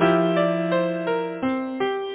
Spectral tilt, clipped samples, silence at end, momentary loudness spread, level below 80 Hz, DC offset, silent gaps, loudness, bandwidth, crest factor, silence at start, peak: -10.5 dB/octave; under 0.1%; 0 s; 6 LU; -60 dBFS; under 0.1%; none; -23 LUFS; 4 kHz; 16 dB; 0 s; -6 dBFS